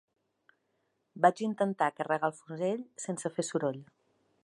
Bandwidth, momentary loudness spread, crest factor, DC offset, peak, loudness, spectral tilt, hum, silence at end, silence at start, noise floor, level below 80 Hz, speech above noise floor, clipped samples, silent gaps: 11.5 kHz; 9 LU; 24 dB; under 0.1%; -10 dBFS; -32 LUFS; -5 dB/octave; none; 0.6 s; 1.15 s; -78 dBFS; -86 dBFS; 47 dB; under 0.1%; none